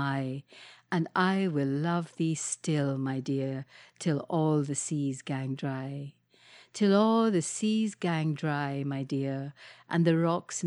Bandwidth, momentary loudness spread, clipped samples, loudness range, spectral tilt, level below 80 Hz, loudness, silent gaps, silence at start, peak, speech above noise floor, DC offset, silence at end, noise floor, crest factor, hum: 11.5 kHz; 12 LU; under 0.1%; 3 LU; -5.5 dB/octave; -76 dBFS; -30 LUFS; none; 0 s; -10 dBFS; 28 dB; under 0.1%; 0 s; -57 dBFS; 18 dB; none